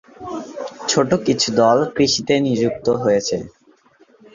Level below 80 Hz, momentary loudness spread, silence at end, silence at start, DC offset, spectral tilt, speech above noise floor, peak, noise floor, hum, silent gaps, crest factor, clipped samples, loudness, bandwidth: -54 dBFS; 15 LU; 0.85 s; 0.2 s; under 0.1%; -4 dB/octave; 36 dB; -2 dBFS; -53 dBFS; none; none; 16 dB; under 0.1%; -18 LUFS; 7.8 kHz